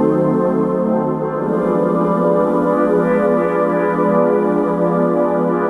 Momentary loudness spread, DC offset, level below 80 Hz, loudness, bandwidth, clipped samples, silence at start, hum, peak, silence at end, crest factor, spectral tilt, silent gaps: 3 LU; under 0.1%; -50 dBFS; -16 LUFS; 11 kHz; under 0.1%; 0 s; none; -2 dBFS; 0 s; 12 dB; -10 dB/octave; none